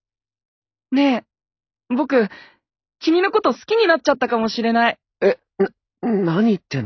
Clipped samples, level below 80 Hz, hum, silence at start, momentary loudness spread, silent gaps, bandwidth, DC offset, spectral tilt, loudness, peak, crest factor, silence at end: under 0.1%; -66 dBFS; none; 0.9 s; 7 LU; none; 6.6 kHz; under 0.1%; -6 dB/octave; -19 LUFS; -4 dBFS; 16 dB; 0 s